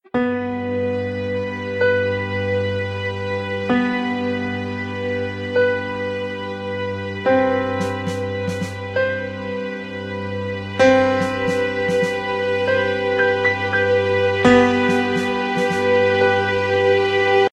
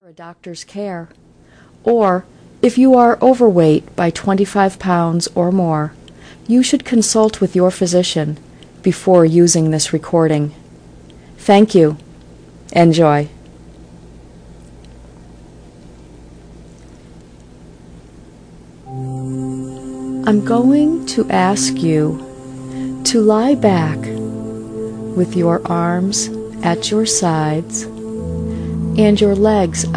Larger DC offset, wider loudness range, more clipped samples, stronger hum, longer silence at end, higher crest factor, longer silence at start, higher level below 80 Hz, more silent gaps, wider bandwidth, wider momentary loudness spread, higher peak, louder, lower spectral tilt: neither; about the same, 6 LU vs 5 LU; neither; neither; about the same, 0.05 s vs 0 s; about the same, 18 dB vs 16 dB; about the same, 0.15 s vs 0.2 s; second, -54 dBFS vs -42 dBFS; neither; about the same, 11 kHz vs 10.5 kHz; second, 10 LU vs 16 LU; about the same, 0 dBFS vs 0 dBFS; second, -20 LUFS vs -15 LUFS; about the same, -6 dB/octave vs -5.5 dB/octave